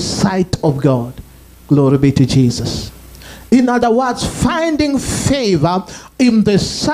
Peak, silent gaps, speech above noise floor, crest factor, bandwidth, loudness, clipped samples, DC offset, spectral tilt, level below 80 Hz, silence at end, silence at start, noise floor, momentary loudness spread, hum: 0 dBFS; none; 22 dB; 14 dB; 15.5 kHz; -14 LUFS; under 0.1%; under 0.1%; -5.5 dB/octave; -36 dBFS; 0 s; 0 s; -35 dBFS; 10 LU; none